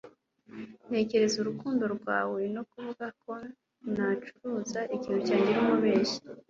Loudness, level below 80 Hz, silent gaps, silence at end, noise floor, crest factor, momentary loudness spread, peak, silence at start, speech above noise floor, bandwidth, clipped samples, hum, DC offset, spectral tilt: -30 LUFS; -70 dBFS; none; 0.1 s; -55 dBFS; 18 dB; 17 LU; -14 dBFS; 0.05 s; 25 dB; 7.6 kHz; under 0.1%; none; under 0.1%; -5 dB/octave